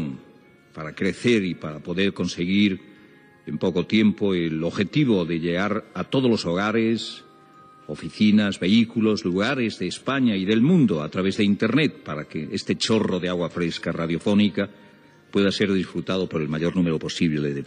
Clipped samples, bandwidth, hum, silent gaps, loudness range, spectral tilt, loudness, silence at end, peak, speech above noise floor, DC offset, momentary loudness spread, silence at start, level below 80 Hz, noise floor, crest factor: under 0.1%; 10 kHz; none; none; 3 LU; -6 dB/octave; -23 LUFS; 0 s; -8 dBFS; 30 dB; under 0.1%; 11 LU; 0 s; -62 dBFS; -52 dBFS; 16 dB